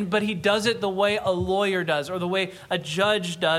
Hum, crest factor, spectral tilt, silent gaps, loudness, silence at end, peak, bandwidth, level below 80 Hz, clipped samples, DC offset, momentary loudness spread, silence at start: none; 16 dB; -4.5 dB/octave; none; -24 LUFS; 0 s; -8 dBFS; 15 kHz; -54 dBFS; under 0.1%; under 0.1%; 5 LU; 0 s